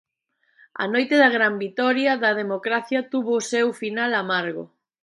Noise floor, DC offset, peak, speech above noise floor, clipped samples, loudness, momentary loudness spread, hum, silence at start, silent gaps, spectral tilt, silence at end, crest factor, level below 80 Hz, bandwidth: -70 dBFS; under 0.1%; -4 dBFS; 48 dB; under 0.1%; -22 LUFS; 8 LU; none; 0.75 s; none; -4 dB/octave; 0.4 s; 20 dB; -76 dBFS; 11.5 kHz